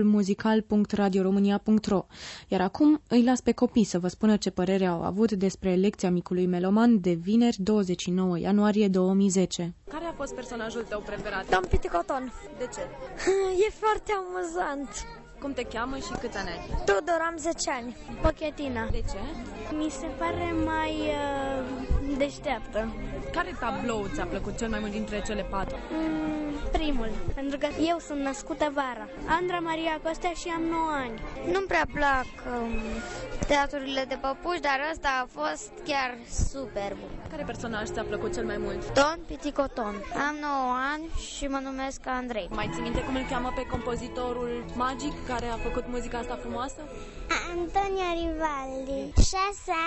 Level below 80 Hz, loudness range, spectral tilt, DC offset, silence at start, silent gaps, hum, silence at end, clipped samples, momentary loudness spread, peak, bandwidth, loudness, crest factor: -40 dBFS; 7 LU; -5.5 dB/octave; under 0.1%; 0 s; none; none; 0 s; under 0.1%; 10 LU; -8 dBFS; 8.4 kHz; -29 LUFS; 20 dB